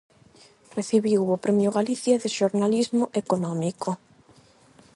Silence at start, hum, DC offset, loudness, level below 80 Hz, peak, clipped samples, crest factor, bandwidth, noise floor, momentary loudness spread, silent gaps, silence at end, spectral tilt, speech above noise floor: 0.75 s; none; under 0.1%; -24 LUFS; -70 dBFS; -8 dBFS; under 0.1%; 16 dB; 11.5 kHz; -56 dBFS; 9 LU; none; 1 s; -6 dB/octave; 32 dB